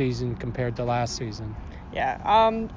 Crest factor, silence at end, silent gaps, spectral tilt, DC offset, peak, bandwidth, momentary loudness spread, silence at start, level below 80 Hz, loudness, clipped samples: 16 dB; 0 s; none; -5.5 dB/octave; under 0.1%; -8 dBFS; 7.6 kHz; 16 LU; 0 s; -42 dBFS; -25 LUFS; under 0.1%